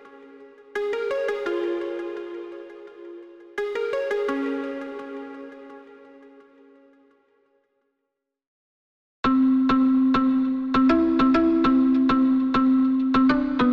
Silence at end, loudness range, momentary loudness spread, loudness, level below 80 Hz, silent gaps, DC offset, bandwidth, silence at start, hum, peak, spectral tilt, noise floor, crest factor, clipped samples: 0 s; 14 LU; 20 LU; -22 LUFS; -50 dBFS; 8.47-9.23 s; under 0.1%; 6.2 kHz; 0.05 s; none; -8 dBFS; -7 dB/octave; -81 dBFS; 16 dB; under 0.1%